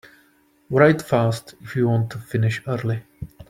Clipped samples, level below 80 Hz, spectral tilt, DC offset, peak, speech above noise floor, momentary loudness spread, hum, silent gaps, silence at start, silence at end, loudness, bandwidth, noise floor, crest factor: under 0.1%; -54 dBFS; -7.5 dB/octave; under 0.1%; -2 dBFS; 39 dB; 14 LU; none; none; 0.7 s; 0.05 s; -21 LUFS; 15.5 kHz; -59 dBFS; 20 dB